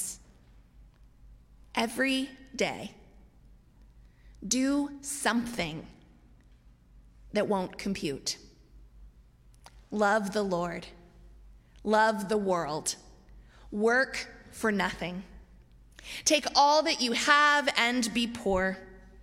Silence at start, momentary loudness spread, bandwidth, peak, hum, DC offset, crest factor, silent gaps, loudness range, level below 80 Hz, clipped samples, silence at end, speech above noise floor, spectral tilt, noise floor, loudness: 0 s; 18 LU; 16 kHz; -8 dBFS; none; under 0.1%; 24 dB; none; 9 LU; -56 dBFS; under 0.1%; 0 s; 29 dB; -3 dB/octave; -58 dBFS; -28 LUFS